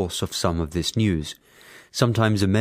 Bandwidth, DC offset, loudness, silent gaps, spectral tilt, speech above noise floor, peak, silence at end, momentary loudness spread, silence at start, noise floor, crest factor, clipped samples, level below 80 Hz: 16 kHz; under 0.1%; -23 LUFS; none; -5.5 dB/octave; 27 dB; -4 dBFS; 0 s; 12 LU; 0 s; -49 dBFS; 20 dB; under 0.1%; -46 dBFS